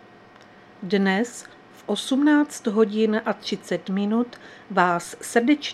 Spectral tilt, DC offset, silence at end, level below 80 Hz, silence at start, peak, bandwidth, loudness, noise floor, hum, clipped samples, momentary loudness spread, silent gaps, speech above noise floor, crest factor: -5 dB/octave; under 0.1%; 0 s; -72 dBFS; 0.8 s; -2 dBFS; 13.5 kHz; -23 LUFS; -49 dBFS; none; under 0.1%; 11 LU; none; 26 dB; 22 dB